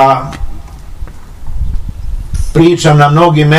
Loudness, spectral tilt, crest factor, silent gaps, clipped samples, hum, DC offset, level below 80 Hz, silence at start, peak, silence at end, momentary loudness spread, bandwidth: -9 LUFS; -6.5 dB/octave; 10 dB; none; 2%; none; under 0.1%; -20 dBFS; 0 s; 0 dBFS; 0 s; 24 LU; 12 kHz